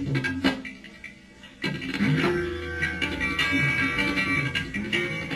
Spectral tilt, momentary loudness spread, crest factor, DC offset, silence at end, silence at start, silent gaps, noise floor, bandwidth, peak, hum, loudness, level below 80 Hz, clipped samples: -5 dB/octave; 14 LU; 18 dB; under 0.1%; 0 s; 0 s; none; -48 dBFS; 13 kHz; -10 dBFS; none; -25 LUFS; -46 dBFS; under 0.1%